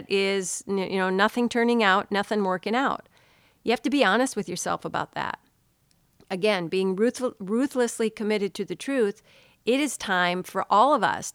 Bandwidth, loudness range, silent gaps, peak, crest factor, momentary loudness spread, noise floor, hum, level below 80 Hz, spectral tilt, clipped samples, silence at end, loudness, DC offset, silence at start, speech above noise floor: 17 kHz; 3 LU; none; -6 dBFS; 20 dB; 10 LU; -66 dBFS; none; -66 dBFS; -4 dB/octave; under 0.1%; 0.05 s; -25 LUFS; under 0.1%; 0 s; 41 dB